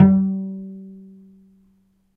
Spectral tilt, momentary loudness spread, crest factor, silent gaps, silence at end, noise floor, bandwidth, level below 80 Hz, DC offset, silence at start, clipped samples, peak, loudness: -13 dB/octave; 25 LU; 20 dB; none; 1.2 s; -61 dBFS; 2.3 kHz; -54 dBFS; under 0.1%; 0 s; under 0.1%; 0 dBFS; -21 LUFS